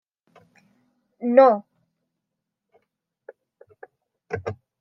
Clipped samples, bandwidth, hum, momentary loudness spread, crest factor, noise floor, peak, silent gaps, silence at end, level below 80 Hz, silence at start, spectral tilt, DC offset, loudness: under 0.1%; 6 kHz; none; 19 LU; 24 dB; -83 dBFS; -2 dBFS; none; 0.25 s; -74 dBFS; 1.2 s; -8.5 dB/octave; under 0.1%; -20 LUFS